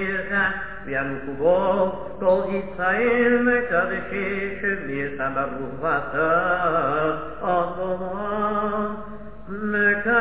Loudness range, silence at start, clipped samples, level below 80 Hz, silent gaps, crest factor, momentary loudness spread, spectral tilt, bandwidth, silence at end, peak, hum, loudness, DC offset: 3 LU; 0 s; under 0.1%; -48 dBFS; none; 16 dB; 9 LU; -9.5 dB/octave; 4 kHz; 0 s; -8 dBFS; none; -23 LUFS; 1%